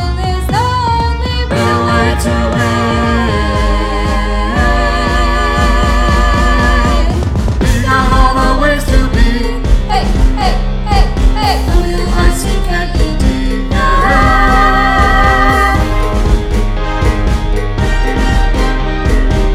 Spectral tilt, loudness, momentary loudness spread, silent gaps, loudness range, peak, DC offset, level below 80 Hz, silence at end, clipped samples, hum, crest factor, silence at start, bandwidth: -5.5 dB/octave; -12 LUFS; 6 LU; none; 3 LU; 0 dBFS; under 0.1%; -12 dBFS; 0 s; 0.1%; none; 10 dB; 0 s; 13.5 kHz